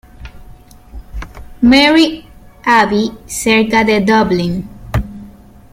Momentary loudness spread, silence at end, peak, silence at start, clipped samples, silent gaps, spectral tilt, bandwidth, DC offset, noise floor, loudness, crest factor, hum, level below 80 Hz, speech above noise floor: 22 LU; 0.45 s; 0 dBFS; 0.2 s; under 0.1%; none; -4.5 dB/octave; 16 kHz; under 0.1%; -38 dBFS; -12 LUFS; 14 dB; none; -32 dBFS; 26 dB